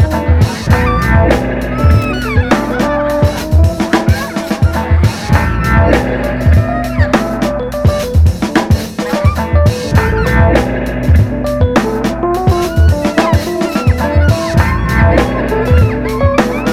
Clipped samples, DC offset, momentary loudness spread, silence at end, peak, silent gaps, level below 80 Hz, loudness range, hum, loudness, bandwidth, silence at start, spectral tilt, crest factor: under 0.1%; 0.4%; 4 LU; 0 s; 0 dBFS; none; -18 dBFS; 1 LU; none; -12 LUFS; 15 kHz; 0 s; -7 dB/octave; 10 dB